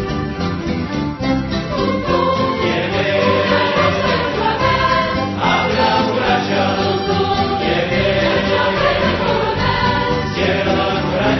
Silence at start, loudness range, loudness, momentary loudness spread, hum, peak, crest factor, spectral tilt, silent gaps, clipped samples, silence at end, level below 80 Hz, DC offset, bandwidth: 0 s; 1 LU; -16 LUFS; 5 LU; none; -2 dBFS; 14 dB; -6 dB/octave; none; under 0.1%; 0 s; -34 dBFS; under 0.1%; 6.2 kHz